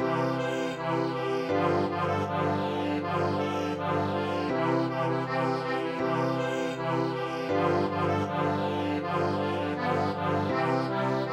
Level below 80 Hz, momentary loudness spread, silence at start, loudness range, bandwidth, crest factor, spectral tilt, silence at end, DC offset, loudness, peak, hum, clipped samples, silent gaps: -66 dBFS; 3 LU; 0 s; 0 LU; 14 kHz; 16 dB; -7 dB/octave; 0 s; under 0.1%; -29 LUFS; -12 dBFS; none; under 0.1%; none